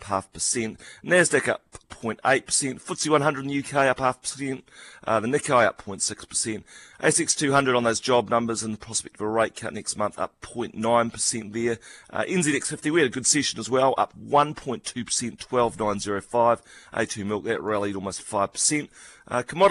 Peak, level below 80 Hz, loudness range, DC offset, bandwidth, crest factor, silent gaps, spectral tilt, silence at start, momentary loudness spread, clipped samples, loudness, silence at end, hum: -6 dBFS; -58 dBFS; 3 LU; under 0.1%; 12.5 kHz; 20 dB; none; -3 dB/octave; 0 s; 11 LU; under 0.1%; -24 LUFS; 0 s; none